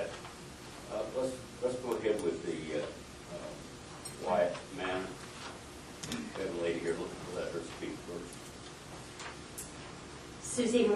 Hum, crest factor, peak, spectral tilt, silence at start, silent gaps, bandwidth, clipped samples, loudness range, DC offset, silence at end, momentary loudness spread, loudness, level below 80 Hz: none; 22 dB; -16 dBFS; -4 dB/octave; 0 s; none; 12.5 kHz; under 0.1%; 5 LU; under 0.1%; 0 s; 14 LU; -38 LUFS; -60 dBFS